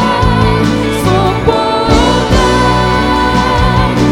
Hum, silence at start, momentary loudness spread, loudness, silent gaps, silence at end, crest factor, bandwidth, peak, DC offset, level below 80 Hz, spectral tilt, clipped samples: none; 0 s; 2 LU; -10 LUFS; none; 0 s; 10 dB; 17 kHz; 0 dBFS; under 0.1%; -20 dBFS; -5.5 dB/octave; 0.2%